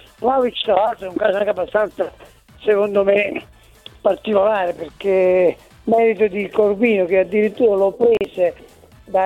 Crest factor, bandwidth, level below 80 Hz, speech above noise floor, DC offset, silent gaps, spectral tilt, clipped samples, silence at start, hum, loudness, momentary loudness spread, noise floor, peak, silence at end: 16 dB; 12 kHz; -52 dBFS; 27 dB; under 0.1%; none; -6.5 dB/octave; under 0.1%; 0.2 s; none; -18 LUFS; 7 LU; -44 dBFS; -2 dBFS; 0 s